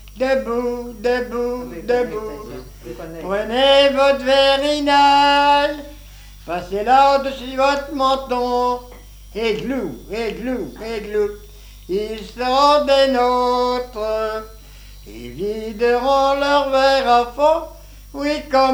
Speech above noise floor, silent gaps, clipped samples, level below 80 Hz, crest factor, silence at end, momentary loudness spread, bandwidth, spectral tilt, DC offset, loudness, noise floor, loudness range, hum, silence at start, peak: 22 dB; none; under 0.1%; -40 dBFS; 18 dB; 0 s; 17 LU; over 20 kHz; -4 dB/octave; under 0.1%; -18 LUFS; -40 dBFS; 8 LU; 50 Hz at -60 dBFS; 0 s; 0 dBFS